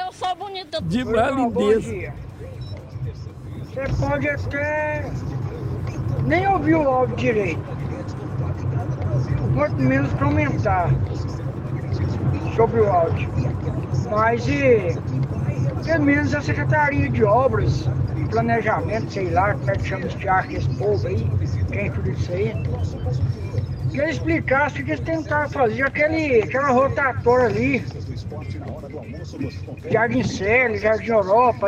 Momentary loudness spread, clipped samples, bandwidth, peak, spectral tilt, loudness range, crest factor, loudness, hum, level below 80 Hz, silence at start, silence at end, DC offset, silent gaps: 12 LU; under 0.1%; 9.2 kHz; -4 dBFS; -7.5 dB/octave; 4 LU; 16 dB; -21 LUFS; none; -38 dBFS; 0 s; 0 s; under 0.1%; none